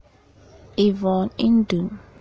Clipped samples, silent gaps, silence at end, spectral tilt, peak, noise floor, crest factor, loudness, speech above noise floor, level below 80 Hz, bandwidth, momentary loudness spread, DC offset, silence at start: under 0.1%; none; 0.2 s; -8 dB/octave; -8 dBFS; -52 dBFS; 14 dB; -21 LUFS; 32 dB; -50 dBFS; 7 kHz; 10 LU; under 0.1%; 0.75 s